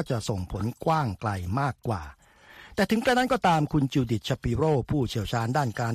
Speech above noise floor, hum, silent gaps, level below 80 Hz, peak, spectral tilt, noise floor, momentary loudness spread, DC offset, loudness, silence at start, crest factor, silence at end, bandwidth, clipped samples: 25 dB; none; none; -46 dBFS; -8 dBFS; -6 dB/octave; -51 dBFS; 9 LU; under 0.1%; -27 LUFS; 0 s; 18 dB; 0 s; 14.5 kHz; under 0.1%